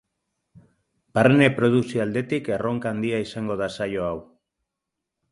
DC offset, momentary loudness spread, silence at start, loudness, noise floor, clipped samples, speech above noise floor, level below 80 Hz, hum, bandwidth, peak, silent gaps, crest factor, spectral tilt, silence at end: under 0.1%; 11 LU; 1.15 s; -23 LUFS; -83 dBFS; under 0.1%; 61 dB; -56 dBFS; none; 11.5 kHz; -4 dBFS; none; 22 dB; -7 dB/octave; 1.1 s